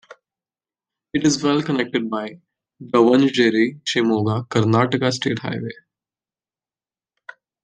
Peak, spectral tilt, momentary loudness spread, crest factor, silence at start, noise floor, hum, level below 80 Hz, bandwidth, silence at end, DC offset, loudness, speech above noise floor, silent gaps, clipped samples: -2 dBFS; -5.5 dB/octave; 12 LU; 18 dB; 0.1 s; under -90 dBFS; none; -64 dBFS; 9.8 kHz; 1.9 s; under 0.1%; -19 LUFS; over 71 dB; none; under 0.1%